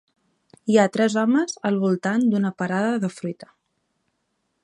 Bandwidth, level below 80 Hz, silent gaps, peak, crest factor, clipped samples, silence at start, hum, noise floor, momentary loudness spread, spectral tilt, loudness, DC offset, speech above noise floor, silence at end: 11 kHz; -72 dBFS; none; -4 dBFS; 18 dB; under 0.1%; 0.65 s; none; -74 dBFS; 14 LU; -6 dB/octave; -21 LUFS; under 0.1%; 53 dB; 1.2 s